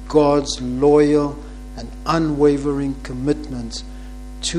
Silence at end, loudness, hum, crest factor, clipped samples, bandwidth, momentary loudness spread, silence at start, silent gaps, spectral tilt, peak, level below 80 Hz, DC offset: 0 s; -19 LUFS; 50 Hz at -35 dBFS; 16 dB; under 0.1%; 11 kHz; 20 LU; 0 s; none; -5.5 dB/octave; -2 dBFS; -34 dBFS; under 0.1%